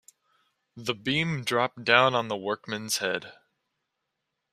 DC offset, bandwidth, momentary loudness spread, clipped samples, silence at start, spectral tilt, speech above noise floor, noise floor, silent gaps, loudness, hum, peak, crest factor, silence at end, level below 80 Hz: under 0.1%; 15 kHz; 12 LU; under 0.1%; 0.75 s; -3.5 dB/octave; 55 dB; -82 dBFS; none; -26 LUFS; none; -2 dBFS; 26 dB; 1.2 s; -70 dBFS